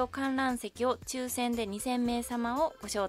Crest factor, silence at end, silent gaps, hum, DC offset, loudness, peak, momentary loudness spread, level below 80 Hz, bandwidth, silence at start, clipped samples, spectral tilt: 16 dB; 0 s; none; none; under 0.1%; -32 LUFS; -16 dBFS; 3 LU; -56 dBFS; 16 kHz; 0 s; under 0.1%; -3.5 dB/octave